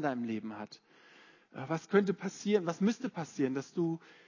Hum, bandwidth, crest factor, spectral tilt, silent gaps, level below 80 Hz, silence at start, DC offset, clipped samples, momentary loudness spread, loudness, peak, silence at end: none; 7.4 kHz; 22 dB; -6.5 dB/octave; none; -82 dBFS; 0 s; under 0.1%; under 0.1%; 16 LU; -34 LUFS; -14 dBFS; 0.15 s